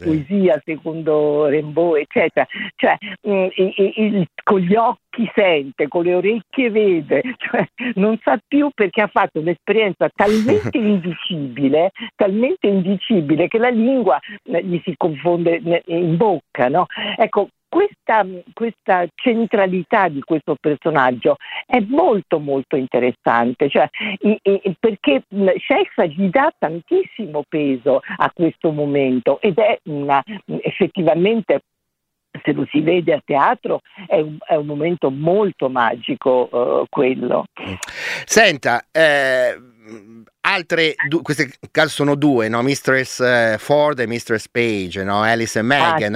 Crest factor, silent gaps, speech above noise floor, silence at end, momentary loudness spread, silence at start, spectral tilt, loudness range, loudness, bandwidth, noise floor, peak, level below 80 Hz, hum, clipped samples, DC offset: 16 dB; none; 58 dB; 0 s; 6 LU; 0 s; -5.5 dB/octave; 2 LU; -18 LUFS; 15.5 kHz; -76 dBFS; 0 dBFS; -60 dBFS; none; under 0.1%; under 0.1%